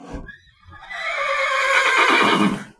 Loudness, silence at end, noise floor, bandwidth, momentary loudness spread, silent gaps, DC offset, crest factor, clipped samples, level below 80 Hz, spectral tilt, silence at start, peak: -17 LUFS; 0.1 s; -45 dBFS; 11 kHz; 19 LU; none; under 0.1%; 16 dB; under 0.1%; -48 dBFS; -3.5 dB/octave; 0 s; -4 dBFS